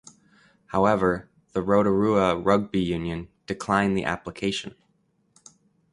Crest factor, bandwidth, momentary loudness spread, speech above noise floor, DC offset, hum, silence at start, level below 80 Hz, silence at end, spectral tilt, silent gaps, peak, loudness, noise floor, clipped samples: 20 dB; 11.5 kHz; 12 LU; 45 dB; under 0.1%; none; 0.7 s; -50 dBFS; 1.25 s; -6 dB/octave; none; -4 dBFS; -24 LUFS; -68 dBFS; under 0.1%